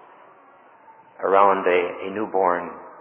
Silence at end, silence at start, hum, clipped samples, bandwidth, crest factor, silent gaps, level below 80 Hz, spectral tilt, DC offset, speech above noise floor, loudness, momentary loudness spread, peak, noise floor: 0 s; 0.9 s; none; under 0.1%; 3.7 kHz; 22 dB; none; -66 dBFS; -8.5 dB/octave; under 0.1%; 31 dB; -21 LUFS; 12 LU; -2 dBFS; -51 dBFS